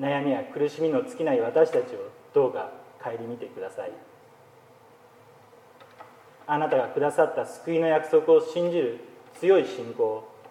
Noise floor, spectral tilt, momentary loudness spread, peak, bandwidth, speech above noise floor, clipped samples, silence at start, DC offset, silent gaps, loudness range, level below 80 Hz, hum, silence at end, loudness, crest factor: -54 dBFS; -6.5 dB/octave; 15 LU; -8 dBFS; 11.5 kHz; 29 dB; under 0.1%; 0 s; under 0.1%; none; 16 LU; -82 dBFS; none; 0 s; -25 LUFS; 20 dB